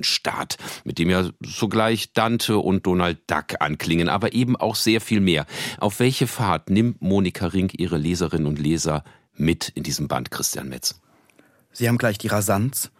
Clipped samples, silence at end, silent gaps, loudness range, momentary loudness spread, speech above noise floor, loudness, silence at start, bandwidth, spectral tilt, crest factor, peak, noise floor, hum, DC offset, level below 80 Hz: under 0.1%; 0.15 s; none; 4 LU; 6 LU; 35 dB; -22 LUFS; 0 s; 16.5 kHz; -4.5 dB/octave; 20 dB; -2 dBFS; -57 dBFS; none; under 0.1%; -48 dBFS